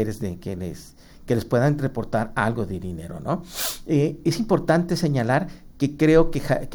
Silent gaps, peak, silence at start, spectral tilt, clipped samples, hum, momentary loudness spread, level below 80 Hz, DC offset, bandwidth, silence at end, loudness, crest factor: none; -4 dBFS; 0 s; -6.5 dB/octave; under 0.1%; none; 13 LU; -38 dBFS; under 0.1%; over 20 kHz; 0 s; -23 LUFS; 18 dB